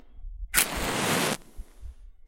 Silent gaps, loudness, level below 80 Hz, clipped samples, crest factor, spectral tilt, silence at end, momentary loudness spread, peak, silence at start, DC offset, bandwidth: none; -26 LUFS; -42 dBFS; under 0.1%; 30 dB; -2 dB/octave; 0 s; 22 LU; 0 dBFS; 0.05 s; under 0.1%; 16.5 kHz